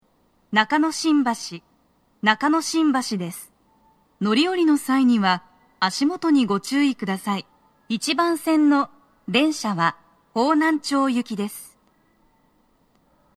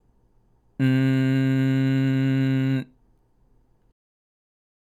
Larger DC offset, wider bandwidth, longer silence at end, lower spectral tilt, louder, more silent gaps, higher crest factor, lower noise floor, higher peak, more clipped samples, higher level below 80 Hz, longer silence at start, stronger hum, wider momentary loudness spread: neither; first, 14 kHz vs 8 kHz; second, 1.7 s vs 2.05 s; second, -4 dB/octave vs -8.5 dB/octave; about the same, -21 LUFS vs -22 LUFS; neither; first, 22 dB vs 14 dB; about the same, -63 dBFS vs -61 dBFS; first, -2 dBFS vs -10 dBFS; neither; second, -70 dBFS vs -64 dBFS; second, 0.5 s vs 0.8 s; neither; first, 11 LU vs 7 LU